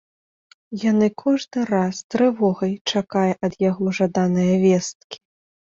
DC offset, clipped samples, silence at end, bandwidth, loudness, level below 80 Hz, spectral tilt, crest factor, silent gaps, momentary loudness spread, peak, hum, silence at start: under 0.1%; under 0.1%; 0.6 s; 7.6 kHz; -21 LUFS; -60 dBFS; -6 dB/octave; 16 dB; 2.04-2.10 s, 2.81-2.85 s, 4.95-5.10 s; 9 LU; -6 dBFS; none; 0.7 s